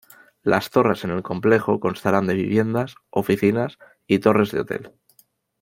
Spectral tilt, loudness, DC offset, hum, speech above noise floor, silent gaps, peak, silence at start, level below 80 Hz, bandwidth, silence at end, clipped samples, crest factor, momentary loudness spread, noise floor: -7 dB/octave; -21 LUFS; under 0.1%; none; 40 dB; none; -2 dBFS; 0.45 s; -58 dBFS; 16.5 kHz; 0.75 s; under 0.1%; 20 dB; 8 LU; -60 dBFS